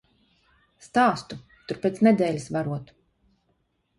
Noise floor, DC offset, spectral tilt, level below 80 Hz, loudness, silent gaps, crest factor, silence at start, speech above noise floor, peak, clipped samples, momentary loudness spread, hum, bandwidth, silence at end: -71 dBFS; under 0.1%; -6.5 dB/octave; -64 dBFS; -24 LUFS; none; 20 dB; 0.85 s; 48 dB; -6 dBFS; under 0.1%; 16 LU; none; 11.5 kHz; 1.15 s